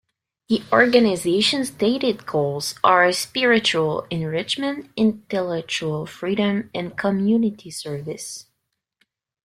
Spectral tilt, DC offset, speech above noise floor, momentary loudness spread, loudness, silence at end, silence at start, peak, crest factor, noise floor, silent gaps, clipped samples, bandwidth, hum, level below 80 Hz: -4.5 dB/octave; under 0.1%; 56 dB; 14 LU; -21 LUFS; 1.05 s; 0.5 s; -2 dBFS; 20 dB; -77 dBFS; none; under 0.1%; 15 kHz; none; -62 dBFS